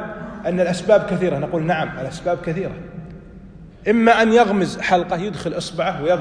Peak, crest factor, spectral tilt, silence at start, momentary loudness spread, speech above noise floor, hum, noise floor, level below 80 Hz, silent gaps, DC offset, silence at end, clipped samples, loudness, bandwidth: -2 dBFS; 18 dB; -6 dB/octave; 0 s; 14 LU; 22 dB; none; -40 dBFS; -46 dBFS; none; under 0.1%; 0 s; under 0.1%; -19 LUFS; 10.5 kHz